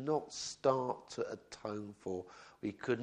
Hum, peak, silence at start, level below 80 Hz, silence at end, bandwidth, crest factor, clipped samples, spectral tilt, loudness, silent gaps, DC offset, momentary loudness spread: none; -16 dBFS; 0 s; -74 dBFS; 0 s; 10.5 kHz; 22 dB; under 0.1%; -4.5 dB/octave; -39 LUFS; none; under 0.1%; 11 LU